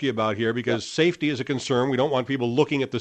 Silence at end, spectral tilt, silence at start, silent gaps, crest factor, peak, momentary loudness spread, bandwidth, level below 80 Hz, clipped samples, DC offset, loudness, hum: 0 s; -5.5 dB/octave; 0 s; none; 18 dB; -6 dBFS; 4 LU; 9.2 kHz; -64 dBFS; under 0.1%; under 0.1%; -24 LUFS; none